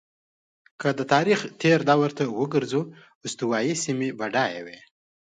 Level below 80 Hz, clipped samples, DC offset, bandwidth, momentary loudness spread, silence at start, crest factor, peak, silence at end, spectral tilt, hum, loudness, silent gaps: -70 dBFS; under 0.1%; under 0.1%; 9.4 kHz; 14 LU; 0.8 s; 20 dB; -6 dBFS; 0.55 s; -5 dB/octave; none; -24 LUFS; 3.15-3.21 s